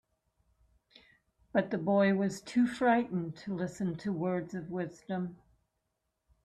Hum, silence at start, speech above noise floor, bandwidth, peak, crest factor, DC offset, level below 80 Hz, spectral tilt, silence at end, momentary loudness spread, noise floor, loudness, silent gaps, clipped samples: none; 1.55 s; 52 dB; 12 kHz; -14 dBFS; 20 dB; under 0.1%; -70 dBFS; -7 dB/octave; 1.1 s; 11 LU; -83 dBFS; -32 LUFS; none; under 0.1%